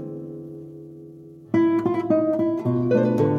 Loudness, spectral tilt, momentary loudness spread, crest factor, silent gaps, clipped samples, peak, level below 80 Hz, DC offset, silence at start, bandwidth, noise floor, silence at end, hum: -21 LUFS; -9.5 dB/octave; 21 LU; 14 dB; none; under 0.1%; -8 dBFS; -62 dBFS; under 0.1%; 0 s; 6.8 kHz; -43 dBFS; 0 s; none